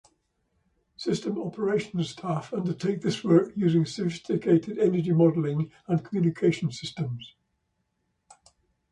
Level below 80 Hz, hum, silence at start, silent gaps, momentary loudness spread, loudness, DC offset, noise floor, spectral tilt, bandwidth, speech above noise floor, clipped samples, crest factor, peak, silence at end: -66 dBFS; none; 1 s; none; 10 LU; -27 LUFS; under 0.1%; -76 dBFS; -7.5 dB/octave; 11 kHz; 51 dB; under 0.1%; 20 dB; -8 dBFS; 1.65 s